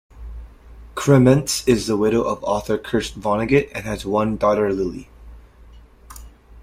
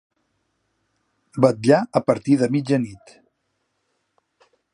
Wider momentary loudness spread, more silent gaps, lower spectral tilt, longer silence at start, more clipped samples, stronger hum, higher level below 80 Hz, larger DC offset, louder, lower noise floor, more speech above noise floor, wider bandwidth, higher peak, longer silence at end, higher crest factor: first, 20 LU vs 8 LU; neither; about the same, -6 dB/octave vs -7 dB/octave; second, 0.15 s vs 1.35 s; neither; neither; first, -40 dBFS vs -64 dBFS; neither; about the same, -19 LUFS vs -19 LUFS; second, -45 dBFS vs -73 dBFS; second, 27 dB vs 54 dB; first, 16 kHz vs 11 kHz; about the same, -2 dBFS vs -2 dBFS; second, 0 s vs 1.8 s; about the same, 18 dB vs 22 dB